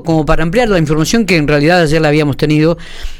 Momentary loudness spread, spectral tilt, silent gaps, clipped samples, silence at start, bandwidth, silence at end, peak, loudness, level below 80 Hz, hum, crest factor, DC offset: 3 LU; -6 dB/octave; none; under 0.1%; 0 s; 16 kHz; 0 s; 0 dBFS; -11 LUFS; -24 dBFS; none; 10 dB; under 0.1%